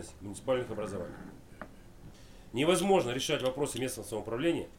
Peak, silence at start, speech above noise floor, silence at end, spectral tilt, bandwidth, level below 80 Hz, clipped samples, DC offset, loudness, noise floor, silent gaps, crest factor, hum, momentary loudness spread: -14 dBFS; 0 s; 20 dB; 0 s; -4.5 dB/octave; 16.5 kHz; -56 dBFS; under 0.1%; 0.1%; -32 LUFS; -52 dBFS; none; 20 dB; none; 22 LU